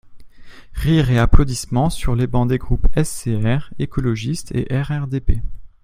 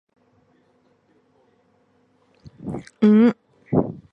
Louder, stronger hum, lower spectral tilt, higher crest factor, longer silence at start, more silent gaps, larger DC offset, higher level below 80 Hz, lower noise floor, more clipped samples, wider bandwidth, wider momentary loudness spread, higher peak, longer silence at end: about the same, -20 LUFS vs -20 LUFS; neither; second, -6.5 dB/octave vs -9 dB/octave; about the same, 16 dB vs 18 dB; second, 0.05 s vs 2.65 s; neither; neither; first, -22 dBFS vs -54 dBFS; second, -36 dBFS vs -62 dBFS; neither; first, 15 kHz vs 5.8 kHz; second, 9 LU vs 21 LU; first, 0 dBFS vs -6 dBFS; about the same, 0.15 s vs 0.15 s